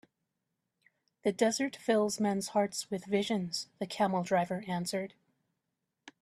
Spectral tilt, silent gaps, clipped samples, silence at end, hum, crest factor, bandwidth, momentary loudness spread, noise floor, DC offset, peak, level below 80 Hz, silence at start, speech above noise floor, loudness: -4.5 dB/octave; none; under 0.1%; 0.1 s; none; 18 dB; 14 kHz; 8 LU; -85 dBFS; under 0.1%; -16 dBFS; -76 dBFS; 1.25 s; 53 dB; -32 LUFS